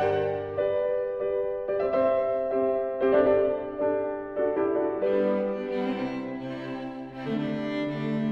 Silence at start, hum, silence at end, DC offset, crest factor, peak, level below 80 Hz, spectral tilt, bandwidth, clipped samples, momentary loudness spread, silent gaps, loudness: 0 s; none; 0 s; under 0.1%; 16 dB; -10 dBFS; -60 dBFS; -8.5 dB/octave; 6 kHz; under 0.1%; 10 LU; none; -27 LUFS